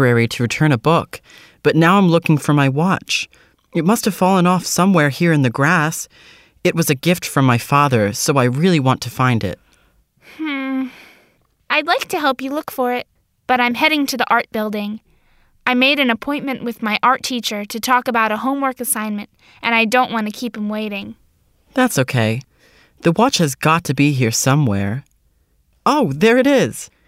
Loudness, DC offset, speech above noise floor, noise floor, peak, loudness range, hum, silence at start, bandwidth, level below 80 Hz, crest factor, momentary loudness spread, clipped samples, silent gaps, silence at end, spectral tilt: -17 LUFS; under 0.1%; 43 dB; -60 dBFS; -2 dBFS; 5 LU; none; 0 s; 16 kHz; -56 dBFS; 16 dB; 11 LU; under 0.1%; none; 0.2 s; -5 dB/octave